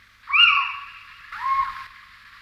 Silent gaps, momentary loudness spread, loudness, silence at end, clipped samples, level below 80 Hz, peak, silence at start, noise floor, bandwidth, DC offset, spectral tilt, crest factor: none; 24 LU; -19 LUFS; 0.55 s; under 0.1%; -58 dBFS; -4 dBFS; 0.25 s; -47 dBFS; 15 kHz; under 0.1%; 1 dB/octave; 20 dB